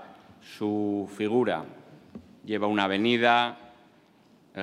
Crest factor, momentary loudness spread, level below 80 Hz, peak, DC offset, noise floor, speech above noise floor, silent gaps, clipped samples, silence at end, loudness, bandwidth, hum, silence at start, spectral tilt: 22 dB; 25 LU; -76 dBFS; -6 dBFS; under 0.1%; -59 dBFS; 33 dB; none; under 0.1%; 0 s; -26 LUFS; 13 kHz; none; 0 s; -6 dB/octave